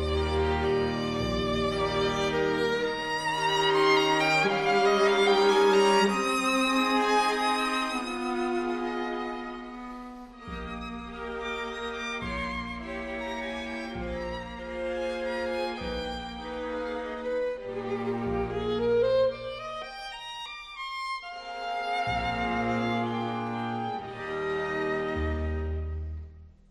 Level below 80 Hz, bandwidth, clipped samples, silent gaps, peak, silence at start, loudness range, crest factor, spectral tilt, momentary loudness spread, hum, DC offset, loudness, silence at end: -44 dBFS; 13.5 kHz; under 0.1%; none; -10 dBFS; 0 s; 11 LU; 18 dB; -4.5 dB/octave; 15 LU; none; under 0.1%; -28 LUFS; 0.2 s